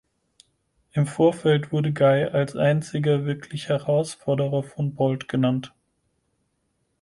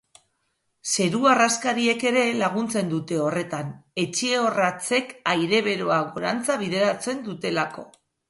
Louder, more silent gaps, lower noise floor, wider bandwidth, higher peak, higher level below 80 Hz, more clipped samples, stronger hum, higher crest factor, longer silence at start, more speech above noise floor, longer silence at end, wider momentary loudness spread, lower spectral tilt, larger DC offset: about the same, -23 LUFS vs -23 LUFS; neither; about the same, -72 dBFS vs -73 dBFS; about the same, 11.5 kHz vs 11.5 kHz; about the same, -8 dBFS vs -6 dBFS; first, -62 dBFS vs -68 dBFS; neither; neither; about the same, 16 dB vs 18 dB; about the same, 0.95 s vs 0.85 s; about the same, 50 dB vs 50 dB; first, 1.35 s vs 0.4 s; about the same, 10 LU vs 9 LU; first, -7 dB/octave vs -3.5 dB/octave; neither